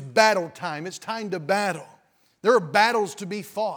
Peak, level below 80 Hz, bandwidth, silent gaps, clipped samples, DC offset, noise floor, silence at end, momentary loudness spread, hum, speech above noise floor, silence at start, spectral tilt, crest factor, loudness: -2 dBFS; -80 dBFS; over 20 kHz; none; under 0.1%; under 0.1%; -61 dBFS; 0 s; 13 LU; none; 37 dB; 0 s; -3.5 dB/octave; 22 dB; -24 LUFS